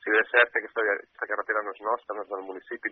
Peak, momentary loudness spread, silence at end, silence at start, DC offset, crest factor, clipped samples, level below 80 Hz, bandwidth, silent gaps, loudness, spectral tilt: -6 dBFS; 14 LU; 0 s; 0.05 s; under 0.1%; 22 dB; under 0.1%; -80 dBFS; 4.2 kHz; none; -27 LUFS; 2 dB/octave